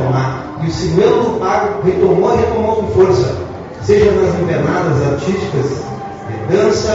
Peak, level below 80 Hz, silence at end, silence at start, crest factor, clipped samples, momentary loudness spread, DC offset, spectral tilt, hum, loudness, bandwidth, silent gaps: 0 dBFS; -38 dBFS; 0 s; 0 s; 14 dB; under 0.1%; 12 LU; under 0.1%; -6.5 dB/octave; none; -14 LUFS; 7.8 kHz; none